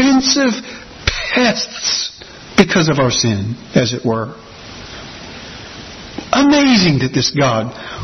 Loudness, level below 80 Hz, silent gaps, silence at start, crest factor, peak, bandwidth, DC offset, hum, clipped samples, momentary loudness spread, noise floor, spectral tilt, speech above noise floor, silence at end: -14 LUFS; -40 dBFS; none; 0 s; 16 dB; 0 dBFS; 6.4 kHz; under 0.1%; none; under 0.1%; 20 LU; -35 dBFS; -4 dB/octave; 20 dB; 0 s